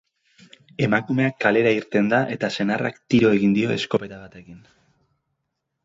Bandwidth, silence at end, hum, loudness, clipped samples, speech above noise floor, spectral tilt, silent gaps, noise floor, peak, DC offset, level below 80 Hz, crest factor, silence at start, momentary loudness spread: 7.8 kHz; 1.25 s; none; -21 LUFS; under 0.1%; 57 dB; -6.5 dB/octave; none; -78 dBFS; -4 dBFS; under 0.1%; -58 dBFS; 20 dB; 0.8 s; 8 LU